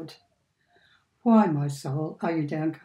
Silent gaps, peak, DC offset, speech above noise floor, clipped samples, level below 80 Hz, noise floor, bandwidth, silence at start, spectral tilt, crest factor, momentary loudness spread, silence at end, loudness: none; -8 dBFS; under 0.1%; 46 dB; under 0.1%; -74 dBFS; -70 dBFS; 12 kHz; 0 s; -8 dB/octave; 20 dB; 10 LU; 0.1 s; -25 LUFS